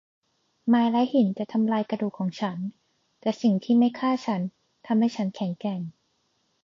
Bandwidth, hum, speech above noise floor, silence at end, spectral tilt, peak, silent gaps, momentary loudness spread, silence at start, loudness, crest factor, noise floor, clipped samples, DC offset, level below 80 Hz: 7.4 kHz; none; 47 dB; 0.75 s; -7.5 dB/octave; -12 dBFS; none; 11 LU; 0.65 s; -26 LUFS; 14 dB; -71 dBFS; under 0.1%; under 0.1%; -76 dBFS